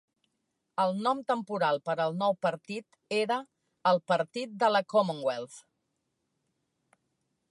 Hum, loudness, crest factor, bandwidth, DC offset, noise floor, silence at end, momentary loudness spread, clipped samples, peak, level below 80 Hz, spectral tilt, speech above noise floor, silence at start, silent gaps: none; -30 LUFS; 20 dB; 11.5 kHz; under 0.1%; -81 dBFS; 1.9 s; 12 LU; under 0.1%; -12 dBFS; -84 dBFS; -5.5 dB/octave; 52 dB; 0.8 s; none